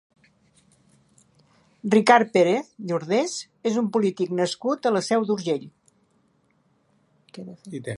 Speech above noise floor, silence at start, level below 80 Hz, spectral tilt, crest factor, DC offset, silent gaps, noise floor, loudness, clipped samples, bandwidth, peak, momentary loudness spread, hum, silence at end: 43 dB; 1.85 s; -74 dBFS; -5 dB/octave; 22 dB; under 0.1%; none; -65 dBFS; -23 LUFS; under 0.1%; 11.5 kHz; -2 dBFS; 18 LU; none; 0 s